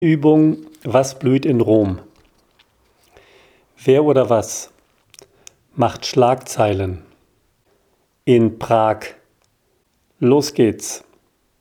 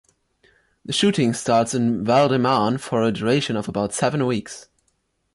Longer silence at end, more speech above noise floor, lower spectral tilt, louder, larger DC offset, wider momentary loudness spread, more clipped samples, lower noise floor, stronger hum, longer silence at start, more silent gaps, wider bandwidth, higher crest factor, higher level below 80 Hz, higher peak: about the same, 0.65 s vs 0.7 s; about the same, 48 dB vs 49 dB; about the same, -6 dB/octave vs -5 dB/octave; first, -17 LUFS vs -20 LUFS; neither; first, 15 LU vs 8 LU; neither; second, -64 dBFS vs -69 dBFS; neither; second, 0 s vs 0.9 s; neither; first, 18 kHz vs 11.5 kHz; about the same, 18 dB vs 14 dB; about the same, -54 dBFS vs -56 dBFS; first, 0 dBFS vs -6 dBFS